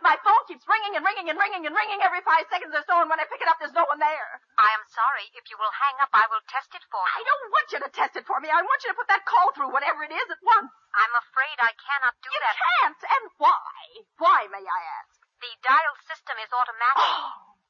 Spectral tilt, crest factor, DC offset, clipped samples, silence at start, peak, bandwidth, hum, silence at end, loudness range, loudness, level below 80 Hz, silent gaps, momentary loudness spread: -0.5 dB/octave; 16 dB; under 0.1%; under 0.1%; 0 s; -8 dBFS; 7 kHz; none; 0.3 s; 2 LU; -23 LUFS; under -90 dBFS; none; 10 LU